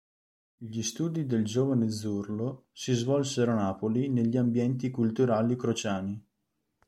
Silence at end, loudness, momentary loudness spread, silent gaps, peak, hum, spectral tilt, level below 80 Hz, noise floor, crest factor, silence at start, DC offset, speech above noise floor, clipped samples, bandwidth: 0.7 s; -29 LUFS; 9 LU; none; -12 dBFS; none; -6 dB/octave; -68 dBFS; -80 dBFS; 16 dB; 0.6 s; under 0.1%; 52 dB; under 0.1%; 13 kHz